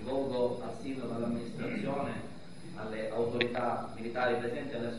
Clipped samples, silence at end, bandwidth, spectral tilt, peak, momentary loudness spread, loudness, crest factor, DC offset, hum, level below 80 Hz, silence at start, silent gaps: under 0.1%; 0 s; 11.5 kHz; -6.5 dB/octave; -12 dBFS; 11 LU; -35 LUFS; 24 dB; 0.5%; none; -62 dBFS; 0 s; none